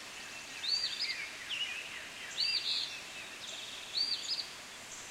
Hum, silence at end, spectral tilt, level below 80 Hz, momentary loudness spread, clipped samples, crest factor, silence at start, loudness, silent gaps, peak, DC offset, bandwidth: none; 0 s; 1 dB/octave; -74 dBFS; 12 LU; under 0.1%; 18 dB; 0 s; -36 LUFS; none; -20 dBFS; under 0.1%; 16 kHz